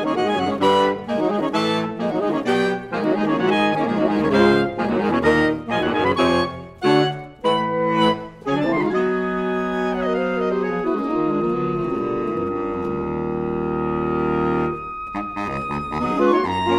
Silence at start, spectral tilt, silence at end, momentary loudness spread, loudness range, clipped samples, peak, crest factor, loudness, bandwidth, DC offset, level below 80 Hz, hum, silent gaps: 0 s; -6.5 dB/octave; 0 s; 7 LU; 4 LU; under 0.1%; -4 dBFS; 16 dB; -21 LUFS; 11.5 kHz; under 0.1%; -46 dBFS; none; none